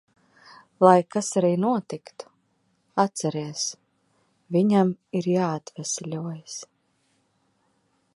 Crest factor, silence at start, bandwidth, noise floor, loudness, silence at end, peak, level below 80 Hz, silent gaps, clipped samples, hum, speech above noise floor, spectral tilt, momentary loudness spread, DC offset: 24 dB; 0.8 s; 11.5 kHz; -69 dBFS; -24 LUFS; 1.5 s; -2 dBFS; -74 dBFS; none; under 0.1%; none; 46 dB; -5.5 dB/octave; 19 LU; under 0.1%